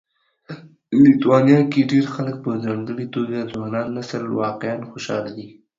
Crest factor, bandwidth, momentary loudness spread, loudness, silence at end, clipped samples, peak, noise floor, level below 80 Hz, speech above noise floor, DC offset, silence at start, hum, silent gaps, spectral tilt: 18 dB; 7.6 kHz; 18 LU; -20 LUFS; 0.3 s; under 0.1%; -2 dBFS; -39 dBFS; -60 dBFS; 20 dB; under 0.1%; 0.5 s; none; none; -7.5 dB/octave